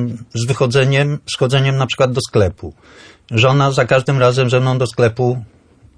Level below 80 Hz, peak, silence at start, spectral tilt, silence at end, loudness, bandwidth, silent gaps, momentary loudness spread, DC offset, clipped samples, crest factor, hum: -46 dBFS; -2 dBFS; 0 s; -6 dB/octave; 0.55 s; -15 LUFS; 10.5 kHz; none; 8 LU; under 0.1%; under 0.1%; 14 dB; none